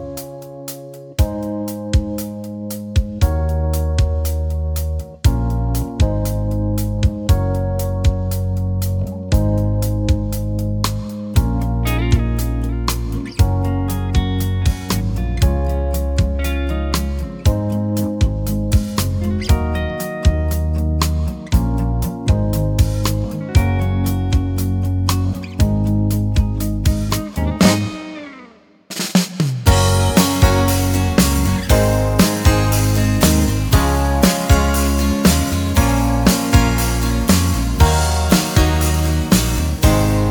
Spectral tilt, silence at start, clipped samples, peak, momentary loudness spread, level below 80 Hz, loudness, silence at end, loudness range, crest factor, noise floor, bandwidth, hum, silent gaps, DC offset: -5.5 dB/octave; 0 s; under 0.1%; -2 dBFS; 7 LU; -22 dBFS; -18 LUFS; 0 s; 5 LU; 16 dB; -44 dBFS; over 20 kHz; none; none; under 0.1%